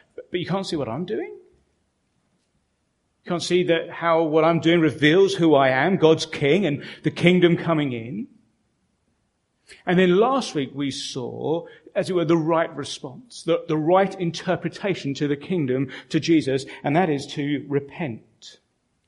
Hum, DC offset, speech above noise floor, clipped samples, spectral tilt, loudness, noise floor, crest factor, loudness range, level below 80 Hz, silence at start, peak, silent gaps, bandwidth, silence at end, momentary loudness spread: none; under 0.1%; 50 dB; under 0.1%; -6 dB/octave; -22 LUFS; -71 dBFS; 22 dB; 6 LU; -62 dBFS; 0.2 s; -2 dBFS; none; 11.5 kHz; 0.55 s; 13 LU